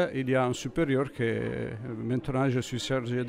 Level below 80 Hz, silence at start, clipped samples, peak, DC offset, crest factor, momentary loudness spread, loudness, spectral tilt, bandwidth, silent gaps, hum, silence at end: -54 dBFS; 0 s; under 0.1%; -14 dBFS; under 0.1%; 14 dB; 7 LU; -29 LUFS; -6 dB/octave; 15 kHz; none; none; 0 s